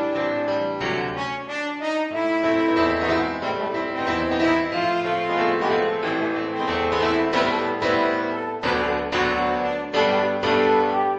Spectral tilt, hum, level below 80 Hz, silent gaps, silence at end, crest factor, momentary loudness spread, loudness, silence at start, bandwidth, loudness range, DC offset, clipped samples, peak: -5.5 dB/octave; none; -50 dBFS; none; 0 s; 16 dB; 6 LU; -22 LUFS; 0 s; 8.8 kHz; 1 LU; under 0.1%; under 0.1%; -6 dBFS